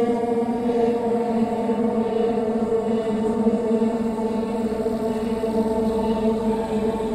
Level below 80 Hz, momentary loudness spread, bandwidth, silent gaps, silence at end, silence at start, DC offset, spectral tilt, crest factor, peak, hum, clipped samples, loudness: -46 dBFS; 3 LU; 12.5 kHz; none; 0 s; 0 s; under 0.1%; -7.5 dB/octave; 14 dB; -8 dBFS; none; under 0.1%; -23 LUFS